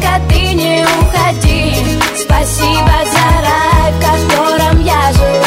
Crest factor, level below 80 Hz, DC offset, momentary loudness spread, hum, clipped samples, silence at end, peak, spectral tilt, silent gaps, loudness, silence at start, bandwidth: 10 dB; -16 dBFS; under 0.1%; 2 LU; none; under 0.1%; 0 s; 0 dBFS; -4.5 dB/octave; none; -10 LUFS; 0 s; 16.5 kHz